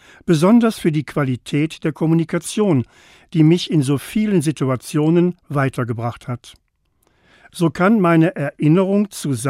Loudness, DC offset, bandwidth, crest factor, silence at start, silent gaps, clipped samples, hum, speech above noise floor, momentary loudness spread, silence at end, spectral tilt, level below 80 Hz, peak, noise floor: -18 LUFS; under 0.1%; 15 kHz; 16 dB; 0.25 s; none; under 0.1%; none; 46 dB; 10 LU; 0 s; -7 dB/octave; -54 dBFS; -2 dBFS; -63 dBFS